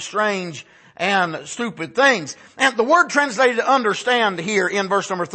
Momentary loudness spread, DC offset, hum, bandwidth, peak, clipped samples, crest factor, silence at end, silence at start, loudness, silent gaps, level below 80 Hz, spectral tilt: 11 LU; under 0.1%; none; 8.8 kHz; -2 dBFS; under 0.1%; 18 dB; 0 s; 0 s; -18 LUFS; none; -70 dBFS; -3 dB/octave